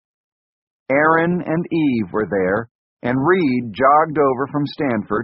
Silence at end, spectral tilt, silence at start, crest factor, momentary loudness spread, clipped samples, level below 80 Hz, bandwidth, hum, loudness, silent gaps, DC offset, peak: 0 s; -5.5 dB/octave; 0.9 s; 16 dB; 8 LU; under 0.1%; -54 dBFS; 5.6 kHz; none; -18 LUFS; 2.71-2.97 s; under 0.1%; -2 dBFS